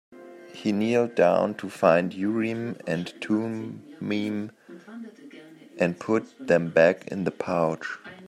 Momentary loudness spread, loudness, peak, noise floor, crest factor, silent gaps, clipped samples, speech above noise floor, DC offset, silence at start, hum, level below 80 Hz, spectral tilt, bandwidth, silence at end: 18 LU; -25 LUFS; -6 dBFS; -47 dBFS; 20 dB; none; under 0.1%; 22 dB; under 0.1%; 0.1 s; none; -70 dBFS; -6.5 dB/octave; 13 kHz; 0 s